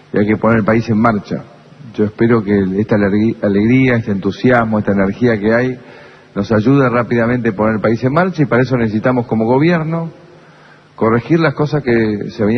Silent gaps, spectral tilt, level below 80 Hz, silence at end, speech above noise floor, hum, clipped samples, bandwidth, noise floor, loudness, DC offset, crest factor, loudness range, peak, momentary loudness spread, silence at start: none; -8.5 dB/octave; -44 dBFS; 0 s; 30 dB; none; under 0.1%; 6.4 kHz; -43 dBFS; -14 LUFS; under 0.1%; 14 dB; 2 LU; 0 dBFS; 7 LU; 0.15 s